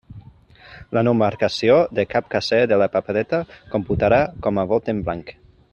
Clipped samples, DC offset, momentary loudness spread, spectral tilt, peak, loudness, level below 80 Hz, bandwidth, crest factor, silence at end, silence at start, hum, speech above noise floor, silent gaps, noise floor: under 0.1%; under 0.1%; 9 LU; -6.5 dB/octave; -2 dBFS; -20 LUFS; -46 dBFS; 8.8 kHz; 18 dB; 0.4 s; 0.1 s; none; 27 dB; none; -47 dBFS